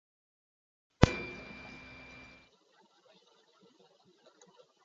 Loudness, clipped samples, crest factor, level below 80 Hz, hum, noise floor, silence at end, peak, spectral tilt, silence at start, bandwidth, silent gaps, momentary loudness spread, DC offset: -32 LUFS; under 0.1%; 36 dB; -48 dBFS; none; -67 dBFS; 3.05 s; -2 dBFS; -5.5 dB/octave; 1 s; 7.6 kHz; none; 23 LU; under 0.1%